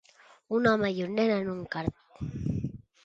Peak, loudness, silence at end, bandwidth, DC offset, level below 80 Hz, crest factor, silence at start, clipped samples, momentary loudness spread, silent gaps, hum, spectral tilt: -10 dBFS; -30 LUFS; 0.25 s; 7.6 kHz; under 0.1%; -52 dBFS; 20 dB; 0.5 s; under 0.1%; 13 LU; none; none; -7.5 dB/octave